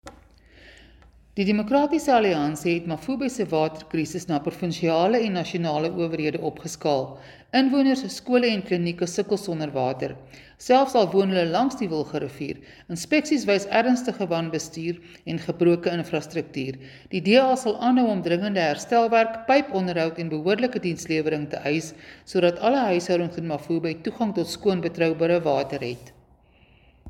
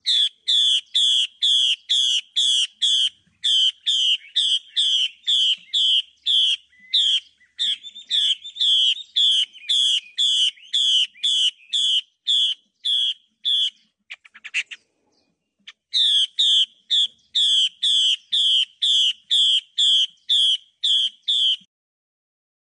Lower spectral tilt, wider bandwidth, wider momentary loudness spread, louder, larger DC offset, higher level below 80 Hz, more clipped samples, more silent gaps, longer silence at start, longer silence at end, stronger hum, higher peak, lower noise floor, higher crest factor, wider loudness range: first, -5.5 dB/octave vs 6.5 dB/octave; first, 17 kHz vs 10.5 kHz; first, 11 LU vs 7 LU; second, -24 LUFS vs -18 LUFS; neither; first, -58 dBFS vs -86 dBFS; neither; neither; about the same, 0.05 s vs 0.05 s; second, 0 s vs 1.1 s; neither; first, -4 dBFS vs -10 dBFS; second, -57 dBFS vs -69 dBFS; first, 18 dB vs 12 dB; about the same, 3 LU vs 4 LU